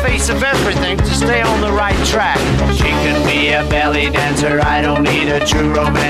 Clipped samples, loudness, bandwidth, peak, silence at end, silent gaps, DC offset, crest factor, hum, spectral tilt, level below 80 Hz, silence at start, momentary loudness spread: under 0.1%; -14 LUFS; 15 kHz; -4 dBFS; 0 s; none; under 0.1%; 10 dB; none; -4.5 dB/octave; -22 dBFS; 0 s; 1 LU